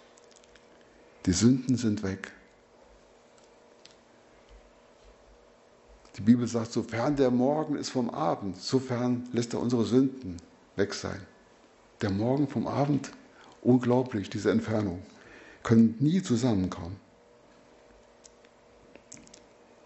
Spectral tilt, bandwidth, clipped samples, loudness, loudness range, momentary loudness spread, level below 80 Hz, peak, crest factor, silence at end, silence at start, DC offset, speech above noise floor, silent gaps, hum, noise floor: -6.5 dB/octave; 8.2 kHz; under 0.1%; -28 LUFS; 6 LU; 19 LU; -60 dBFS; -8 dBFS; 22 dB; 2.9 s; 1.25 s; under 0.1%; 32 dB; none; none; -58 dBFS